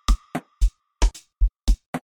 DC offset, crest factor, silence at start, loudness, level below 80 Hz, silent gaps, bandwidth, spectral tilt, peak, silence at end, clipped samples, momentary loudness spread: under 0.1%; 16 dB; 0.1 s; -27 LUFS; -22 dBFS; 1.88-1.93 s; 12 kHz; -5 dB/octave; -6 dBFS; 0.15 s; under 0.1%; 2 LU